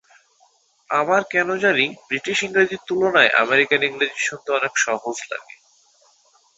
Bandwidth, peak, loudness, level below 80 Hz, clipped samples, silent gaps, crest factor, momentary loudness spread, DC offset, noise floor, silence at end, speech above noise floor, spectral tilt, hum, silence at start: 8 kHz; 0 dBFS; -19 LUFS; -66 dBFS; under 0.1%; none; 20 dB; 11 LU; under 0.1%; -60 dBFS; 1.15 s; 39 dB; -2.5 dB/octave; none; 0.9 s